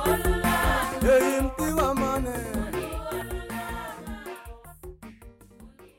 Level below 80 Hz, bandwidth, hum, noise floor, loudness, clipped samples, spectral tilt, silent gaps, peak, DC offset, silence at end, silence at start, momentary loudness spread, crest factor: -36 dBFS; 17 kHz; none; -50 dBFS; -26 LUFS; under 0.1%; -5 dB/octave; none; -12 dBFS; under 0.1%; 0.1 s; 0 s; 23 LU; 16 dB